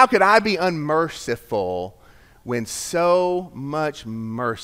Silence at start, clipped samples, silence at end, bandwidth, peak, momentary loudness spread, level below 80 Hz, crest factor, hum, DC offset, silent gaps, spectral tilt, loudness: 0 s; under 0.1%; 0 s; 16 kHz; 0 dBFS; 14 LU; -54 dBFS; 22 dB; none; under 0.1%; none; -4.5 dB/octave; -21 LUFS